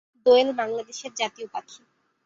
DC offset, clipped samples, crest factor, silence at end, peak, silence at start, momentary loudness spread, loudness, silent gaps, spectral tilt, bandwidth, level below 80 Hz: under 0.1%; under 0.1%; 18 dB; 0.5 s; -6 dBFS; 0.25 s; 17 LU; -23 LUFS; none; -2 dB/octave; 7.8 kHz; -72 dBFS